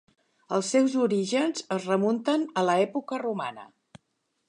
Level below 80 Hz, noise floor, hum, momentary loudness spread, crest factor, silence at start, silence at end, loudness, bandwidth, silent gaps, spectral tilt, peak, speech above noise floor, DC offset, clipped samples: -78 dBFS; -77 dBFS; none; 8 LU; 18 dB; 0.5 s; 0.85 s; -26 LUFS; 11 kHz; none; -5 dB/octave; -10 dBFS; 51 dB; under 0.1%; under 0.1%